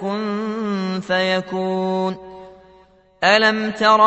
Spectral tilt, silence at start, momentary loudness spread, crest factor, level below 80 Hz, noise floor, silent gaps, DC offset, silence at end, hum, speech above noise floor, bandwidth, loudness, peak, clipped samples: -5 dB/octave; 0 s; 9 LU; 18 dB; -60 dBFS; -52 dBFS; none; under 0.1%; 0 s; none; 35 dB; 8.4 kHz; -19 LUFS; 0 dBFS; under 0.1%